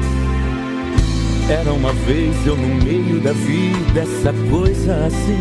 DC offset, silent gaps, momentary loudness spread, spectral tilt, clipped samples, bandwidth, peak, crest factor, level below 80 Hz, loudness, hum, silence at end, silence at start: under 0.1%; none; 3 LU; -7 dB/octave; under 0.1%; 12 kHz; -2 dBFS; 14 dB; -22 dBFS; -17 LUFS; none; 0 s; 0 s